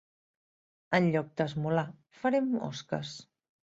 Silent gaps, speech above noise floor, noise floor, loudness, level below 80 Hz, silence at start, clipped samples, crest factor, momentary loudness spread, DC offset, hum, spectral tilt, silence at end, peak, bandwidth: none; over 59 dB; under -90 dBFS; -31 LUFS; -70 dBFS; 0.9 s; under 0.1%; 22 dB; 12 LU; under 0.1%; none; -6.5 dB/octave; 0.55 s; -10 dBFS; 7.8 kHz